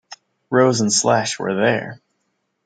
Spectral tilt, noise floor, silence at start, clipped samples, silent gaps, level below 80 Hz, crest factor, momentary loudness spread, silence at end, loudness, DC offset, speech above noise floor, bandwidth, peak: -3.5 dB/octave; -71 dBFS; 0.1 s; under 0.1%; none; -66 dBFS; 18 dB; 8 LU; 0.7 s; -18 LUFS; under 0.1%; 54 dB; 10 kHz; -2 dBFS